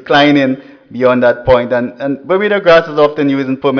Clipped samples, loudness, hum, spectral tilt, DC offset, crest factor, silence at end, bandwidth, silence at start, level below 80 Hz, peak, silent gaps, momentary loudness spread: under 0.1%; -11 LUFS; none; -6.5 dB/octave; under 0.1%; 10 dB; 0 s; 5.4 kHz; 0.05 s; -40 dBFS; 0 dBFS; none; 9 LU